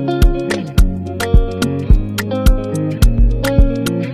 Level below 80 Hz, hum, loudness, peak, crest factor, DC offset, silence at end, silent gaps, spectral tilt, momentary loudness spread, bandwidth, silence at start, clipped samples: -14 dBFS; none; -16 LUFS; 0 dBFS; 12 dB; under 0.1%; 0 s; none; -6.5 dB/octave; 5 LU; 15 kHz; 0 s; under 0.1%